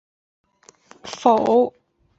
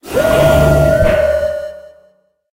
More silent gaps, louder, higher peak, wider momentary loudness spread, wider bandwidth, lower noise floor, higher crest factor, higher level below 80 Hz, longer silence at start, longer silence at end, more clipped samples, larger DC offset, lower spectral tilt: neither; second, -19 LUFS vs -12 LUFS; about the same, -2 dBFS vs 0 dBFS; first, 20 LU vs 12 LU; second, 8 kHz vs 16 kHz; about the same, -51 dBFS vs -54 dBFS; first, 20 dB vs 12 dB; second, -64 dBFS vs -24 dBFS; first, 1.05 s vs 0.05 s; second, 0.5 s vs 0.65 s; neither; neither; about the same, -5 dB/octave vs -6 dB/octave